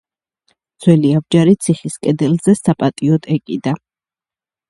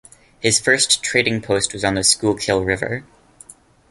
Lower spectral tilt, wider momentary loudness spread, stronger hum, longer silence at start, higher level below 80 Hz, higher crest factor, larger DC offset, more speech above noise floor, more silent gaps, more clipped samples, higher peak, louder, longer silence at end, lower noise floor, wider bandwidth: first, -7 dB/octave vs -2.5 dB/octave; about the same, 8 LU vs 8 LU; neither; first, 0.8 s vs 0.4 s; second, -54 dBFS vs -46 dBFS; about the same, 16 dB vs 20 dB; neither; first, over 76 dB vs 28 dB; neither; neither; about the same, 0 dBFS vs 0 dBFS; about the same, -15 LUFS vs -17 LUFS; about the same, 0.9 s vs 0.9 s; first, under -90 dBFS vs -46 dBFS; about the same, 11.5 kHz vs 12 kHz